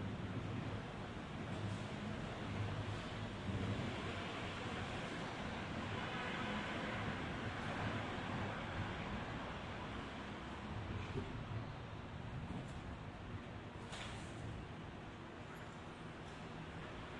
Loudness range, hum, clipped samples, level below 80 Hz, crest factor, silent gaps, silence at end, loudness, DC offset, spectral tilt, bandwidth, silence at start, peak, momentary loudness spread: 7 LU; none; under 0.1%; -58 dBFS; 16 dB; none; 0 s; -46 LUFS; under 0.1%; -6 dB/octave; 11 kHz; 0 s; -30 dBFS; 8 LU